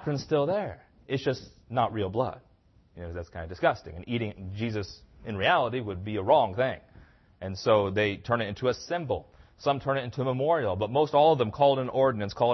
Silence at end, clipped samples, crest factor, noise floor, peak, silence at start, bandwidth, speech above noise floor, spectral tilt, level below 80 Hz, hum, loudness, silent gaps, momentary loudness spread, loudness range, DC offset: 0 s; under 0.1%; 20 dB; -61 dBFS; -8 dBFS; 0 s; 6.2 kHz; 34 dB; -6.5 dB/octave; -56 dBFS; none; -28 LUFS; none; 15 LU; 6 LU; under 0.1%